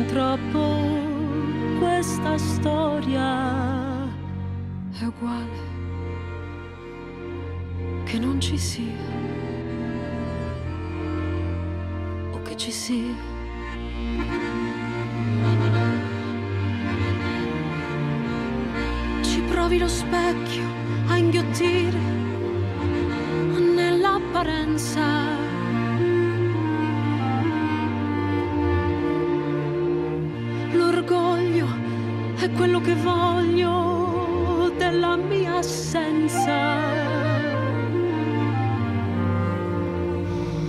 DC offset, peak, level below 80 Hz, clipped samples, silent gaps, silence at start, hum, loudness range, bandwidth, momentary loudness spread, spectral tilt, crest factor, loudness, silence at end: under 0.1%; -10 dBFS; -42 dBFS; under 0.1%; none; 0 s; none; 7 LU; 14 kHz; 10 LU; -6 dB/octave; 14 dB; -24 LUFS; 0 s